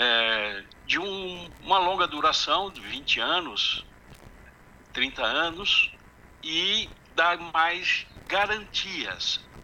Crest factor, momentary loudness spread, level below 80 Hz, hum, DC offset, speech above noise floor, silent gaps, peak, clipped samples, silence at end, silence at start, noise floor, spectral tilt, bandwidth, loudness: 18 dB; 10 LU; -54 dBFS; none; under 0.1%; 25 dB; none; -8 dBFS; under 0.1%; 0 s; 0 s; -52 dBFS; -1.5 dB/octave; 17 kHz; -25 LUFS